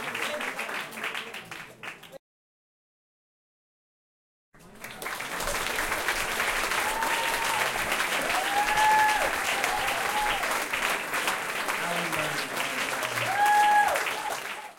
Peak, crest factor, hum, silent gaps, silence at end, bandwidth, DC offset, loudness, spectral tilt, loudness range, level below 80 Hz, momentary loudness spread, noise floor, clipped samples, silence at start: -10 dBFS; 20 dB; none; 2.19-4.52 s; 0.05 s; 17 kHz; under 0.1%; -26 LUFS; -1 dB/octave; 15 LU; -52 dBFS; 14 LU; under -90 dBFS; under 0.1%; 0 s